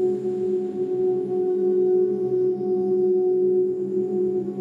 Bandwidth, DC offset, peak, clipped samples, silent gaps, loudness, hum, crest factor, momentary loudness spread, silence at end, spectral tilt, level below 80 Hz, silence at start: 1.9 kHz; under 0.1%; -12 dBFS; under 0.1%; none; -23 LUFS; none; 8 dB; 5 LU; 0 s; -10.5 dB/octave; -70 dBFS; 0 s